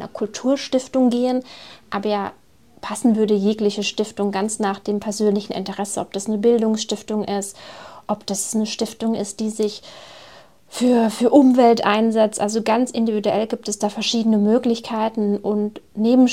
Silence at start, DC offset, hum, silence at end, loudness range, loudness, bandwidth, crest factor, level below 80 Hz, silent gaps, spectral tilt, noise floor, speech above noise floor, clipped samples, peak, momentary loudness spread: 0 s; 0.2%; none; 0 s; 6 LU; -20 LUFS; 14.5 kHz; 20 dB; -62 dBFS; none; -4.5 dB/octave; -47 dBFS; 27 dB; under 0.1%; 0 dBFS; 11 LU